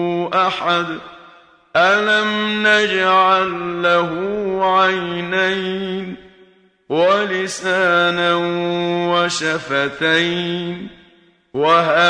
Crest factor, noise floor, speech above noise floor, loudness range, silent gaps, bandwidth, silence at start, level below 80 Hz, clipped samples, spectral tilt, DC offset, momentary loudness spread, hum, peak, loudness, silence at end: 16 dB; -52 dBFS; 35 dB; 3 LU; none; 10.5 kHz; 0 s; -58 dBFS; under 0.1%; -4 dB/octave; under 0.1%; 10 LU; none; -2 dBFS; -17 LUFS; 0 s